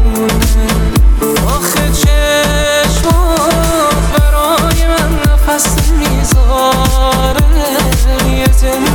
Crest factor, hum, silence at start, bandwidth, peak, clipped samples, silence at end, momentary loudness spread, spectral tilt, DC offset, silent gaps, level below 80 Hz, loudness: 10 dB; none; 0 s; 19 kHz; 0 dBFS; under 0.1%; 0 s; 2 LU; -4.5 dB/octave; 0.3%; none; -12 dBFS; -11 LUFS